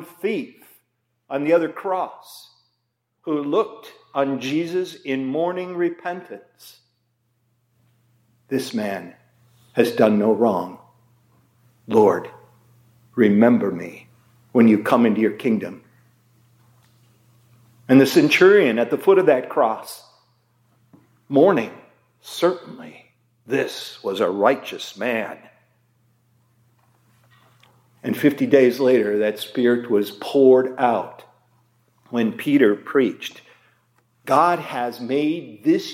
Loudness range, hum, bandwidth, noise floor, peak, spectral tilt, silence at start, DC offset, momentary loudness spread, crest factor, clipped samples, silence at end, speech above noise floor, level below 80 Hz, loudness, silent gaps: 10 LU; none; 16.5 kHz; -74 dBFS; -2 dBFS; -6 dB/octave; 0 s; under 0.1%; 18 LU; 20 dB; under 0.1%; 0 s; 55 dB; -74 dBFS; -20 LUFS; none